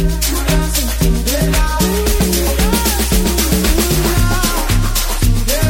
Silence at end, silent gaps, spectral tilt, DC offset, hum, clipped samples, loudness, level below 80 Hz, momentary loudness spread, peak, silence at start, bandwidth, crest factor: 0 s; none; -4 dB/octave; under 0.1%; none; under 0.1%; -15 LUFS; -16 dBFS; 2 LU; 0 dBFS; 0 s; 17 kHz; 14 dB